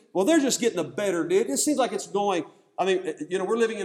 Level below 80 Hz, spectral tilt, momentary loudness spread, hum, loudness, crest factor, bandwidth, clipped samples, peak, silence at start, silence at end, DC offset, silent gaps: -78 dBFS; -3.5 dB/octave; 8 LU; none; -25 LUFS; 16 dB; 16.5 kHz; under 0.1%; -10 dBFS; 0.15 s; 0 s; under 0.1%; none